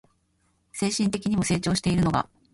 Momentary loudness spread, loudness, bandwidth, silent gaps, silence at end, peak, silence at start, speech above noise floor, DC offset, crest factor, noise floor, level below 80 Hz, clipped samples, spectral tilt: 6 LU; -25 LUFS; 11.5 kHz; none; 0.3 s; -10 dBFS; 0.75 s; 45 dB; under 0.1%; 16 dB; -69 dBFS; -48 dBFS; under 0.1%; -5 dB/octave